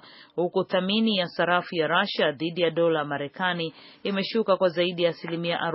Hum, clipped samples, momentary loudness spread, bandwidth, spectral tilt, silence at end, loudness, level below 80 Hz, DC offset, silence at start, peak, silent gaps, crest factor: none; under 0.1%; 7 LU; 5.8 kHz; -3 dB/octave; 0 s; -25 LUFS; -76 dBFS; under 0.1%; 0.05 s; -8 dBFS; none; 18 dB